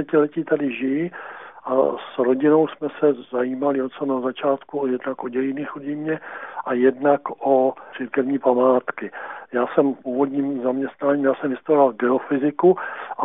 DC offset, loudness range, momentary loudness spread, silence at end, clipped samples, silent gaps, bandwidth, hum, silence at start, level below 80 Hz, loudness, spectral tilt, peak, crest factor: 0.1%; 3 LU; 11 LU; 0 s; under 0.1%; none; 3.9 kHz; none; 0 s; -74 dBFS; -21 LUFS; -2.5 dB/octave; -4 dBFS; 18 dB